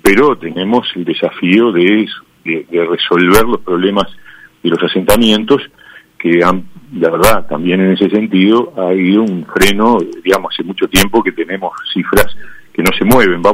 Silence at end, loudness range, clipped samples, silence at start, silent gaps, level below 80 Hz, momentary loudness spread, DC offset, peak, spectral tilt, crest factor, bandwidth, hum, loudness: 0 s; 2 LU; 0.4%; 0 s; none; -34 dBFS; 10 LU; under 0.1%; 0 dBFS; -4.5 dB/octave; 12 dB; over 20 kHz; none; -12 LUFS